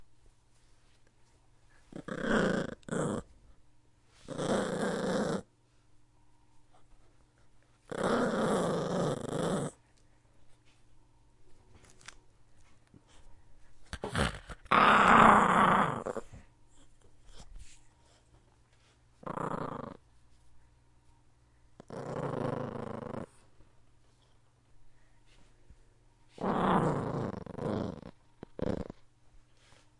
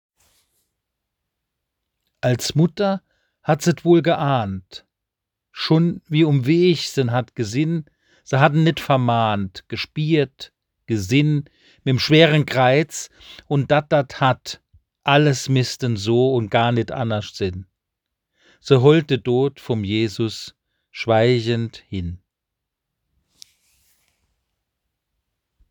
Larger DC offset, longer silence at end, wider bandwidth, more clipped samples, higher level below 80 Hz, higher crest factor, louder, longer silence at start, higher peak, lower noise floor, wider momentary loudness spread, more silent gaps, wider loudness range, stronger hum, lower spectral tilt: neither; second, 1.1 s vs 3.55 s; second, 11.5 kHz vs 20 kHz; neither; about the same, -56 dBFS vs -58 dBFS; first, 28 dB vs 20 dB; second, -30 LUFS vs -19 LUFS; second, 0 s vs 2.25 s; second, -8 dBFS vs 0 dBFS; second, -65 dBFS vs -83 dBFS; first, 25 LU vs 14 LU; neither; first, 19 LU vs 6 LU; neither; about the same, -5.5 dB/octave vs -6 dB/octave